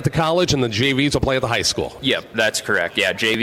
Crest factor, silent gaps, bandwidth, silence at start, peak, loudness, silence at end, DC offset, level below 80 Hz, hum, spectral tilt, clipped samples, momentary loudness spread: 16 dB; none; 16 kHz; 0 s; -4 dBFS; -19 LUFS; 0 s; under 0.1%; -40 dBFS; none; -4 dB/octave; under 0.1%; 3 LU